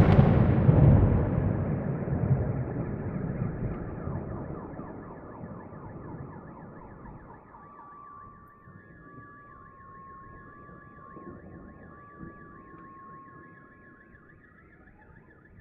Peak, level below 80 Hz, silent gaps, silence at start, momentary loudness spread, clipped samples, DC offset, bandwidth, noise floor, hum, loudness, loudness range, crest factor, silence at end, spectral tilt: -6 dBFS; -42 dBFS; none; 0 s; 27 LU; under 0.1%; under 0.1%; 4.8 kHz; -55 dBFS; none; -26 LUFS; 23 LU; 24 dB; 2.15 s; -9.5 dB/octave